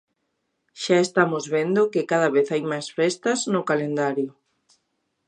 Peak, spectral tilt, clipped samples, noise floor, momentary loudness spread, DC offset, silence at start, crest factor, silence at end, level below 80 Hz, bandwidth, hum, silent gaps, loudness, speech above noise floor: -4 dBFS; -4.5 dB/octave; under 0.1%; -75 dBFS; 7 LU; under 0.1%; 0.75 s; 20 dB; 1 s; -76 dBFS; 10.5 kHz; none; none; -23 LUFS; 53 dB